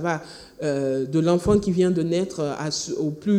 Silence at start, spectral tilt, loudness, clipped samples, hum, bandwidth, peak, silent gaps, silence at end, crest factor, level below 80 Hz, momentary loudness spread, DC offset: 0 s; -6 dB/octave; -23 LUFS; under 0.1%; none; 13.5 kHz; -6 dBFS; none; 0 s; 16 dB; -46 dBFS; 8 LU; under 0.1%